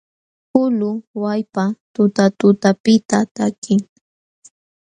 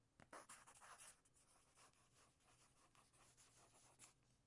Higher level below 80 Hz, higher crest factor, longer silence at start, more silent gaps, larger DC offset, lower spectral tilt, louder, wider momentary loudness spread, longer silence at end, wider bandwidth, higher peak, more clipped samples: first, -62 dBFS vs -88 dBFS; second, 18 dB vs 26 dB; first, 0.55 s vs 0 s; first, 1.07-1.14 s, 1.80-1.94 s, 2.80-2.84 s, 3.05-3.09 s, 3.31-3.35 s, 3.58-3.62 s vs none; neither; first, -6 dB/octave vs -1.5 dB/octave; first, -17 LUFS vs -64 LUFS; about the same, 8 LU vs 7 LU; first, 1.05 s vs 0 s; second, 9.8 kHz vs 12 kHz; first, 0 dBFS vs -44 dBFS; neither